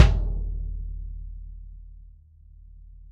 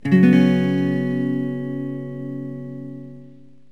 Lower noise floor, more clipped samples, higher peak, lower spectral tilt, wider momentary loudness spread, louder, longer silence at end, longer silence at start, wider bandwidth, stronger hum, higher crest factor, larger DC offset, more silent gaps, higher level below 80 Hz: first, -50 dBFS vs -46 dBFS; neither; first, 0 dBFS vs -4 dBFS; second, -6 dB/octave vs -9 dB/octave; about the same, 22 LU vs 20 LU; second, -30 LUFS vs -20 LUFS; second, 0 s vs 0.4 s; about the same, 0 s vs 0.05 s; first, 7.4 kHz vs 6.2 kHz; neither; first, 26 dB vs 18 dB; second, under 0.1% vs 0.5%; neither; first, -30 dBFS vs -68 dBFS